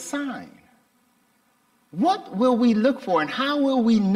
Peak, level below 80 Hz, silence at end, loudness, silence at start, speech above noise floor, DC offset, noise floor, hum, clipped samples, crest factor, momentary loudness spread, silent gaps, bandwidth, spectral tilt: -8 dBFS; -66 dBFS; 0 s; -22 LUFS; 0 s; 43 dB; under 0.1%; -64 dBFS; none; under 0.1%; 14 dB; 12 LU; none; 12 kHz; -6 dB/octave